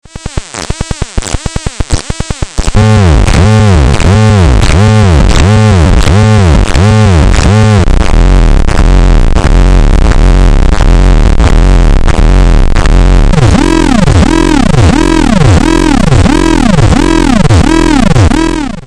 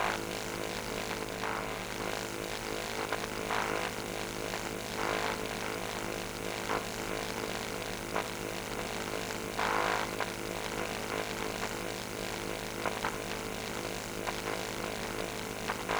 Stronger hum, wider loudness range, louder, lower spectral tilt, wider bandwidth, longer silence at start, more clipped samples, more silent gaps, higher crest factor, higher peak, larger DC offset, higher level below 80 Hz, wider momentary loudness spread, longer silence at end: neither; about the same, 2 LU vs 2 LU; first, -7 LUFS vs -35 LUFS; first, -6 dB/octave vs -3 dB/octave; second, 11.5 kHz vs over 20 kHz; first, 0.15 s vs 0 s; first, 4% vs under 0.1%; neither; second, 4 dB vs 22 dB; first, 0 dBFS vs -14 dBFS; first, 2% vs under 0.1%; first, -8 dBFS vs -54 dBFS; first, 10 LU vs 4 LU; about the same, 0.05 s vs 0 s